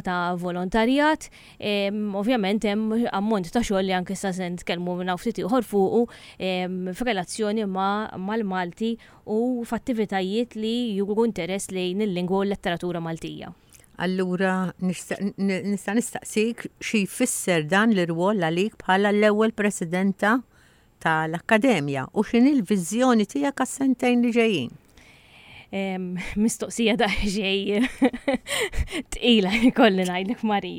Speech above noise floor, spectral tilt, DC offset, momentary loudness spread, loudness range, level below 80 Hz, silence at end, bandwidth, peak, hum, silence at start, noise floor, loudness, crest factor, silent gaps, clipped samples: 31 dB; -5 dB/octave; under 0.1%; 9 LU; 5 LU; -46 dBFS; 0 s; 16.5 kHz; -4 dBFS; none; 0.05 s; -55 dBFS; -24 LUFS; 20 dB; none; under 0.1%